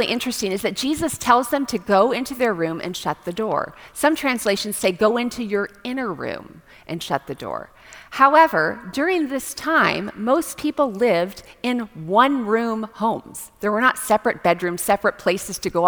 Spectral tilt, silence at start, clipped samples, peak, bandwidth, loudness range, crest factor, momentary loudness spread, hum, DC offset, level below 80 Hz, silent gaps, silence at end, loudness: -4 dB/octave; 0 s; under 0.1%; 0 dBFS; over 20 kHz; 3 LU; 20 dB; 11 LU; none; under 0.1%; -54 dBFS; none; 0 s; -21 LUFS